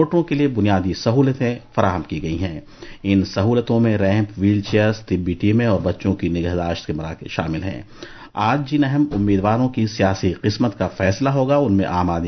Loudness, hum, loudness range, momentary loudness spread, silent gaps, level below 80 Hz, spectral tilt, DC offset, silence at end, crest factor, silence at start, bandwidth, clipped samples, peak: -19 LUFS; none; 3 LU; 9 LU; none; -38 dBFS; -7.5 dB/octave; under 0.1%; 0 s; 18 dB; 0 s; 6.4 kHz; under 0.1%; -2 dBFS